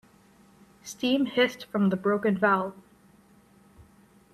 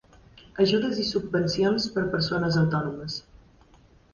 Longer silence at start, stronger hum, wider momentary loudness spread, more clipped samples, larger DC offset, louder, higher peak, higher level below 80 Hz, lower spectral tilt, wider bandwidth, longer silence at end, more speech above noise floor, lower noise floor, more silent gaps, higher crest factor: first, 0.85 s vs 0.55 s; neither; about the same, 13 LU vs 11 LU; neither; neither; about the same, -26 LUFS vs -25 LUFS; about the same, -10 dBFS vs -8 dBFS; second, -68 dBFS vs -54 dBFS; about the same, -5.5 dB/octave vs -6 dB/octave; first, 13.5 kHz vs 7.2 kHz; first, 1.6 s vs 0.95 s; about the same, 33 dB vs 32 dB; about the same, -58 dBFS vs -56 dBFS; neither; about the same, 20 dB vs 18 dB